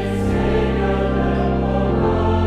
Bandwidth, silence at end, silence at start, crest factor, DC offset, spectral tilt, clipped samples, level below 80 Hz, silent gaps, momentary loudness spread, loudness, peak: 10.5 kHz; 0 s; 0 s; 12 dB; under 0.1%; -8 dB/octave; under 0.1%; -26 dBFS; none; 1 LU; -19 LUFS; -6 dBFS